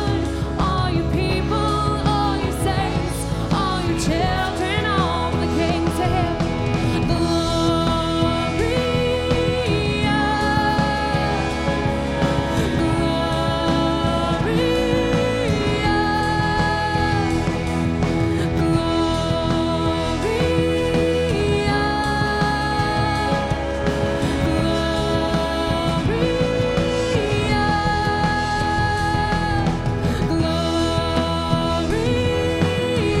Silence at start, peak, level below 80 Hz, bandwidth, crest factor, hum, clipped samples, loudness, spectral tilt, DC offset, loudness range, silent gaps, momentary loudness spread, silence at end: 0 s; -4 dBFS; -30 dBFS; 15 kHz; 16 dB; none; under 0.1%; -20 LUFS; -6 dB/octave; under 0.1%; 1 LU; none; 2 LU; 0 s